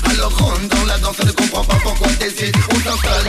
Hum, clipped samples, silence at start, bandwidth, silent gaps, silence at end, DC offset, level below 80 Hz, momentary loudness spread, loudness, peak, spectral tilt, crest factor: none; under 0.1%; 0 s; 16 kHz; none; 0 s; under 0.1%; -20 dBFS; 2 LU; -16 LUFS; -2 dBFS; -4 dB/octave; 12 dB